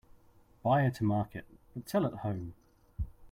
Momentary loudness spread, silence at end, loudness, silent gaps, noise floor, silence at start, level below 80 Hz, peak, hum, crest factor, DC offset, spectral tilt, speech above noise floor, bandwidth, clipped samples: 19 LU; 0 s; -33 LUFS; none; -62 dBFS; 0.65 s; -52 dBFS; -16 dBFS; none; 18 dB; under 0.1%; -8 dB/octave; 30 dB; 16 kHz; under 0.1%